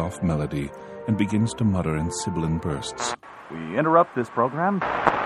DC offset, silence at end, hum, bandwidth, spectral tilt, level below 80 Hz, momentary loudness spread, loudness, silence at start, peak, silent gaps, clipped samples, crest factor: under 0.1%; 0 s; none; 12 kHz; -6 dB/octave; -46 dBFS; 12 LU; -24 LUFS; 0 s; -2 dBFS; none; under 0.1%; 22 dB